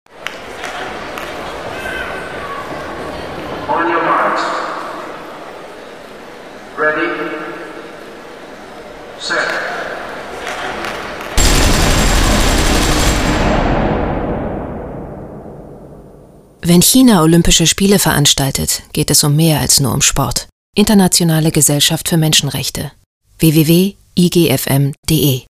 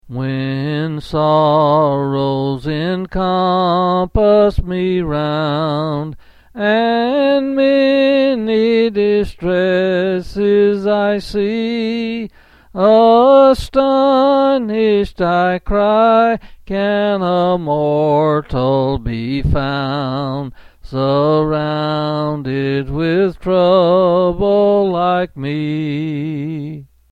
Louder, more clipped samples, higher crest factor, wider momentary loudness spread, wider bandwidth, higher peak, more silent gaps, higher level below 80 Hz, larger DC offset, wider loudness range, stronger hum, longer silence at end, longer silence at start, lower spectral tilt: about the same, -13 LUFS vs -15 LUFS; neither; about the same, 14 dB vs 14 dB; first, 21 LU vs 9 LU; first, 16 kHz vs 10.5 kHz; about the same, 0 dBFS vs 0 dBFS; first, 20.52-20.73 s, 23.06-23.21 s, 24.98-25.03 s vs none; first, -24 dBFS vs -34 dBFS; neither; first, 11 LU vs 5 LU; neither; second, 0.1 s vs 0.25 s; about the same, 0.15 s vs 0.05 s; second, -4 dB/octave vs -8 dB/octave